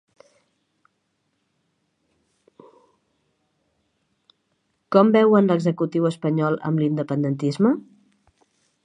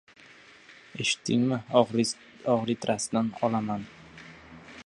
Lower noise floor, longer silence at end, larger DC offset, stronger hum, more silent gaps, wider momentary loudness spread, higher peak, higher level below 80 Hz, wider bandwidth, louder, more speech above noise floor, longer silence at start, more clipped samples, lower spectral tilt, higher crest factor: first, -73 dBFS vs -53 dBFS; first, 1.05 s vs 0.05 s; neither; neither; neither; second, 8 LU vs 22 LU; first, -2 dBFS vs -6 dBFS; second, -74 dBFS vs -66 dBFS; second, 10 kHz vs 11.5 kHz; first, -20 LUFS vs -28 LUFS; first, 53 dB vs 26 dB; first, 4.9 s vs 0.7 s; neither; first, -8.5 dB/octave vs -4.5 dB/octave; about the same, 22 dB vs 22 dB